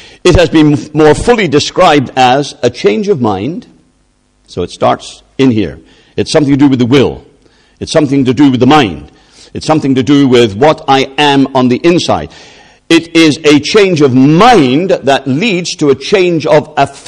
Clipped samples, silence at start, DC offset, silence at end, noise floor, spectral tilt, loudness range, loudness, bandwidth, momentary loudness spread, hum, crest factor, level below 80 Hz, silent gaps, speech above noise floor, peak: 1%; 0.25 s; under 0.1%; 0.1 s; -53 dBFS; -5.5 dB/octave; 5 LU; -8 LUFS; 10.5 kHz; 11 LU; none; 8 dB; -32 dBFS; none; 45 dB; 0 dBFS